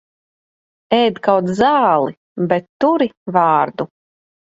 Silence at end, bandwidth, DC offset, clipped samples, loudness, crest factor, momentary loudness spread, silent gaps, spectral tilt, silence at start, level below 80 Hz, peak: 0.65 s; 8 kHz; under 0.1%; under 0.1%; -16 LUFS; 16 dB; 10 LU; 2.17-2.36 s, 2.69-2.80 s, 3.17-3.26 s; -6.5 dB/octave; 0.9 s; -58 dBFS; 0 dBFS